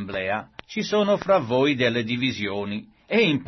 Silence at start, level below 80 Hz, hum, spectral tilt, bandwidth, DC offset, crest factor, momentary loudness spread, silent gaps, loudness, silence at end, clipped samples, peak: 0 s; -60 dBFS; none; -5.5 dB/octave; 6.2 kHz; under 0.1%; 16 dB; 10 LU; none; -23 LUFS; 0 s; under 0.1%; -8 dBFS